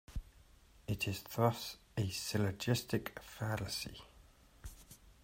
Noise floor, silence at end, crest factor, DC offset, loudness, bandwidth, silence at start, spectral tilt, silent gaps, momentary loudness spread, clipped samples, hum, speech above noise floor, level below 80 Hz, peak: -63 dBFS; 0.1 s; 24 dB; under 0.1%; -38 LUFS; 16 kHz; 0.1 s; -5 dB/octave; none; 21 LU; under 0.1%; none; 26 dB; -56 dBFS; -16 dBFS